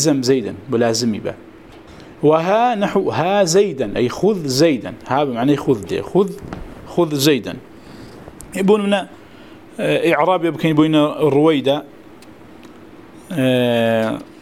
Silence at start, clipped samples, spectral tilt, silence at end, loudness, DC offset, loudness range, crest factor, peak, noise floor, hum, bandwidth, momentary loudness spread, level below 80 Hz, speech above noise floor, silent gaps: 0 s; under 0.1%; -5 dB/octave; 0.1 s; -17 LUFS; 0.2%; 3 LU; 18 dB; 0 dBFS; -41 dBFS; none; 16 kHz; 15 LU; -50 dBFS; 25 dB; none